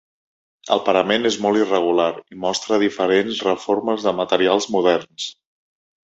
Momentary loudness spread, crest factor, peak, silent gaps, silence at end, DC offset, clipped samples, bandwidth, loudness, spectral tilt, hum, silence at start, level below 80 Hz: 6 LU; 20 dB; 0 dBFS; none; 0.7 s; under 0.1%; under 0.1%; 8.2 kHz; -19 LUFS; -4 dB/octave; none; 0.65 s; -62 dBFS